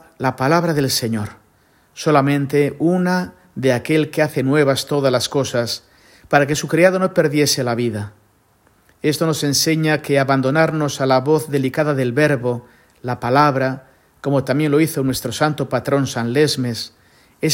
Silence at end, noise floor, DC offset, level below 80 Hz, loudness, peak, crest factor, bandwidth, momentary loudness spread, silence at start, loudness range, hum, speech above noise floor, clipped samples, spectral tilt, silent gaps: 0 s; -57 dBFS; under 0.1%; -54 dBFS; -18 LUFS; 0 dBFS; 18 dB; 16.5 kHz; 9 LU; 0.2 s; 2 LU; none; 39 dB; under 0.1%; -5 dB/octave; none